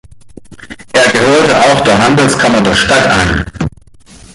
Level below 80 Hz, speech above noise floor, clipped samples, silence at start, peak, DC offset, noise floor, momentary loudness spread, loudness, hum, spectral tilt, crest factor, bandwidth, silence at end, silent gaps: -30 dBFS; 28 dB; under 0.1%; 0.1 s; 0 dBFS; under 0.1%; -37 dBFS; 8 LU; -9 LUFS; none; -4 dB/octave; 10 dB; 11.5 kHz; 0.65 s; none